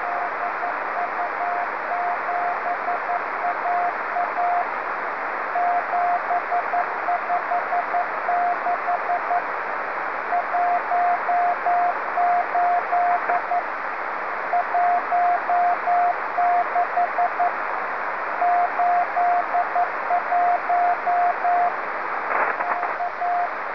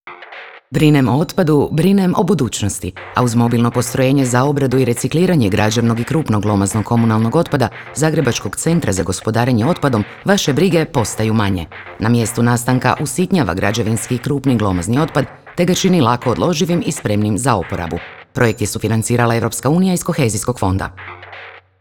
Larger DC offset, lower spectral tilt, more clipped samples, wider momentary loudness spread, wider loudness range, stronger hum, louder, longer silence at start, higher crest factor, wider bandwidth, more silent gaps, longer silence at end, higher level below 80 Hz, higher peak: about the same, 0.5% vs 0.3%; about the same, -5 dB/octave vs -5.5 dB/octave; neither; second, 5 LU vs 8 LU; about the same, 3 LU vs 2 LU; neither; second, -22 LUFS vs -16 LUFS; about the same, 0 s vs 0.05 s; about the same, 14 dB vs 14 dB; second, 5.4 kHz vs 18.5 kHz; neither; second, 0 s vs 0.2 s; second, -68 dBFS vs -44 dBFS; second, -8 dBFS vs 0 dBFS